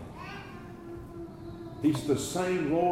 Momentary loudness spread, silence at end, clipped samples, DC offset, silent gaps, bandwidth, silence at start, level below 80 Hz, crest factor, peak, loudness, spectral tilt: 16 LU; 0 s; under 0.1%; under 0.1%; none; 16 kHz; 0 s; -56 dBFS; 16 dB; -16 dBFS; -30 LUFS; -5.5 dB/octave